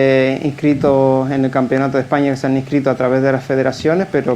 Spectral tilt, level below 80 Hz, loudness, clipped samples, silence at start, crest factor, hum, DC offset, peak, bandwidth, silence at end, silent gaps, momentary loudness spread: -7.5 dB/octave; -50 dBFS; -15 LUFS; under 0.1%; 0 s; 14 dB; none; under 0.1%; 0 dBFS; 9.6 kHz; 0 s; none; 4 LU